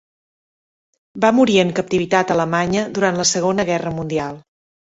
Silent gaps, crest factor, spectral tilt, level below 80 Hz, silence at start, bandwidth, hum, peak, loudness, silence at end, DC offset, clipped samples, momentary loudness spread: none; 16 dB; -4.5 dB/octave; -52 dBFS; 1.15 s; 8.4 kHz; none; -2 dBFS; -18 LUFS; 0.5 s; under 0.1%; under 0.1%; 8 LU